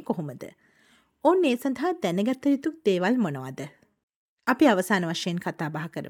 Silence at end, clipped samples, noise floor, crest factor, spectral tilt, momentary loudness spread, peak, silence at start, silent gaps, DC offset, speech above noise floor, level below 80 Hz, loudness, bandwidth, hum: 0 s; under 0.1%; -62 dBFS; 20 dB; -5.5 dB/octave; 16 LU; -6 dBFS; 0 s; 4.03-4.08 s, 4.16-4.37 s; under 0.1%; 37 dB; -72 dBFS; -25 LUFS; 17.5 kHz; none